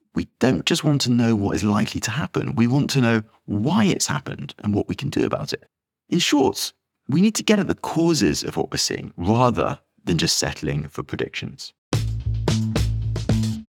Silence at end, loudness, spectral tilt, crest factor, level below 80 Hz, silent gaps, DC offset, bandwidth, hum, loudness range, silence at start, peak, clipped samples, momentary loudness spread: 0.05 s; -22 LUFS; -5 dB/octave; 20 dB; -38 dBFS; 11.78-11.91 s; under 0.1%; 18 kHz; none; 3 LU; 0.15 s; -2 dBFS; under 0.1%; 10 LU